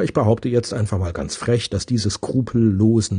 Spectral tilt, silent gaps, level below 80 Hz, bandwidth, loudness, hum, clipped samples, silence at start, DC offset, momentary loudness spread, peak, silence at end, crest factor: -6.5 dB/octave; none; -44 dBFS; 10 kHz; -20 LUFS; none; under 0.1%; 0 s; under 0.1%; 7 LU; -2 dBFS; 0 s; 16 dB